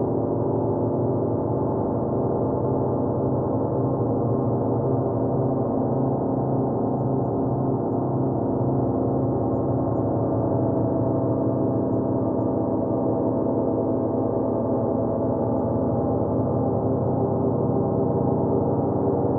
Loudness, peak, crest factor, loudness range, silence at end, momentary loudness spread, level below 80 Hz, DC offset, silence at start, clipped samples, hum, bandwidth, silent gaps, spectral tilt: -23 LUFS; -10 dBFS; 12 dB; 1 LU; 0 s; 1 LU; -48 dBFS; under 0.1%; 0 s; under 0.1%; none; 2 kHz; none; -16 dB/octave